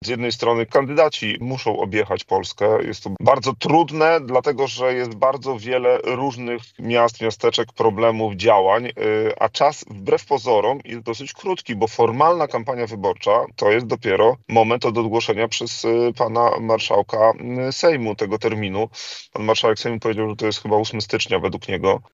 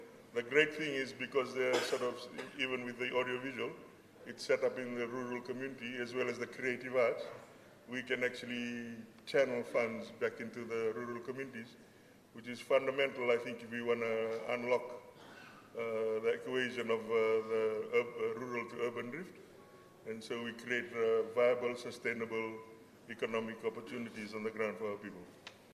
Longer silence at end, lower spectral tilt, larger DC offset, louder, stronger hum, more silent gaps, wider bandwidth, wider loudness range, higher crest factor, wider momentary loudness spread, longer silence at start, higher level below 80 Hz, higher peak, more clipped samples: about the same, 0.1 s vs 0 s; about the same, -5 dB/octave vs -4.5 dB/octave; neither; first, -20 LUFS vs -37 LUFS; neither; neither; second, 7.8 kHz vs 14.5 kHz; about the same, 3 LU vs 4 LU; about the same, 20 dB vs 24 dB; second, 8 LU vs 17 LU; about the same, 0 s vs 0 s; first, -60 dBFS vs -82 dBFS; first, 0 dBFS vs -14 dBFS; neither